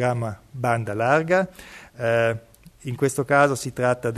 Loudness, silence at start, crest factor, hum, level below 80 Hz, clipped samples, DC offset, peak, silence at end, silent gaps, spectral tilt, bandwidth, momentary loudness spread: -22 LUFS; 0 s; 18 dB; none; -56 dBFS; under 0.1%; under 0.1%; -4 dBFS; 0 s; none; -5.5 dB/octave; 13.5 kHz; 15 LU